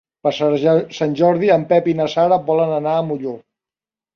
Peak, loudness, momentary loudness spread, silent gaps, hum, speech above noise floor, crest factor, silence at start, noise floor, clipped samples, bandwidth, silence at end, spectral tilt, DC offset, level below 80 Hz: -2 dBFS; -17 LUFS; 9 LU; none; none; over 74 dB; 16 dB; 0.25 s; under -90 dBFS; under 0.1%; 7 kHz; 0.75 s; -7 dB/octave; under 0.1%; -60 dBFS